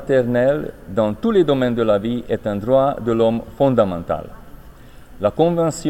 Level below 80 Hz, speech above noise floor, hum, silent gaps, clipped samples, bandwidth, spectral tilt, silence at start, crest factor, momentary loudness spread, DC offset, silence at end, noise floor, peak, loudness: -42 dBFS; 23 dB; none; none; under 0.1%; 16.5 kHz; -7 dB/octave; 0 s; 16 dB; 8 LU; under 0.1%; 0 s; -40 dBFS; -4 dBFS; -19 LUFS